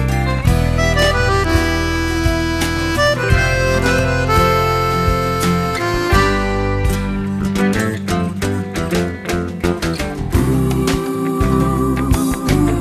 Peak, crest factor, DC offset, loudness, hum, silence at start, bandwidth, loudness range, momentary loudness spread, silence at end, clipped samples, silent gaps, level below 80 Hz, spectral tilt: 0 dBFS; 14 dB; under 0.1%; -16 LUFS; none; 0 s; 14 kHz; 4 LU; 6 LU; 0 s; under 0.1%; none; -24 dBFS; -5.5 dB/octave